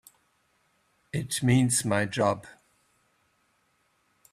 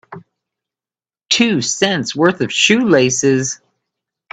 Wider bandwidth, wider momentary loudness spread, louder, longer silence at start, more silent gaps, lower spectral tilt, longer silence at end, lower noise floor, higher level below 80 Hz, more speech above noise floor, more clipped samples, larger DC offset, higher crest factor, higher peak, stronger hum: first, 15 kHz vs 9.4 kHz; first, 13 LU vs 6 LU; second, -26 LUFS vs -14 LUFS; first, 1.15 s vs 0.1 s; neither; about the same, -4.5 dB/octave vs -3.5 dB/octave; first, 1.8 s vs 0.8 s; second, -71 dBFS vs under -90 dBFS; about the same, -62 dBFS vs -58 dBFS; second, 45 dB vs over 76 dB; neither; neither; about the same, 20 dB vs 16 dB; second, -10 dBFS vs 0 dBFS; neither